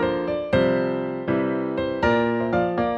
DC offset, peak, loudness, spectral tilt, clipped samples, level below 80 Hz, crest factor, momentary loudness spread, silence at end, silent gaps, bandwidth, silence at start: under 0.1%; -8 dBFS; -23 LUFS; -8 dB/octave; under 0.1%; -46 dBFS; 14 dB; 5 LU; 0 s; none; 7.4 kHz; 0 s